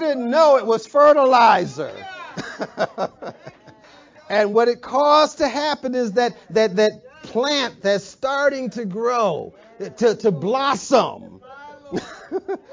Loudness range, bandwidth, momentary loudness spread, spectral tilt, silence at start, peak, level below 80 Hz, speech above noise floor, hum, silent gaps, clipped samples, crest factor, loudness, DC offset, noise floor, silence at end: 5 LU; 7.6 kHz; 16 LU; -4.5 dB/octave; 0 s; -4 dBFS; -62 dBFS; 29 dB; none; none; under 0.1%; 16 dB; -19 LUFS; under 0.1%; -48 dBFS; 0 s